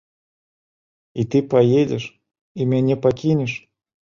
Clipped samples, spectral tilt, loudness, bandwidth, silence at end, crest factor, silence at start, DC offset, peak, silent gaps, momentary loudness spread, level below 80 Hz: under 0.1%; -8 dB/octave; -19 LUFS; 7.4 kHz; 0.45 s; 18 dB; 1.15 s; under 0.1%; -4 dBFS; 2.41-2.55 s; 17 LU; -56 dBFS